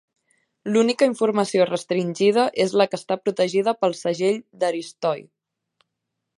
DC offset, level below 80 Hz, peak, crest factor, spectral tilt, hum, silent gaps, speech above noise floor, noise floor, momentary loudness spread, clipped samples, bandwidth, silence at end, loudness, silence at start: under 0.1%; -74 dBFS; -4 dBFS; 18 dB; -5 dB/octave; none; none; 60 dB; -81 dBFS; 7 LU; under 0.1%; 11.5 kHz; 1.15 s; -22 LUFS; 0.65 s